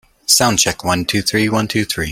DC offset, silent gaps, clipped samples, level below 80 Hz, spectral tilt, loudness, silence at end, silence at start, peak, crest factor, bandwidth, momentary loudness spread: under 0.1%; none; under 0.1%; -42 dBFS; -2.5 dB/octave; -15 LUFS; 0 s; 0.3 s; 0 dBFS; 16 dB; 16.5 kHz; 7 LU